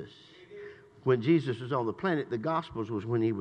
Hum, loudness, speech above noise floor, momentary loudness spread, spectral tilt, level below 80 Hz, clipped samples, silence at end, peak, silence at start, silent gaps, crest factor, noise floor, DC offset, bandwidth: none; -30 LUFS; 23 dB; 21 LU; -8.5 dB/octave; -68 dBFS; under 0.1%; 0 s; -14 dBFS; 0 s; none; 18 dB; -52 dBFS; under 0.1%; 8.6 kHz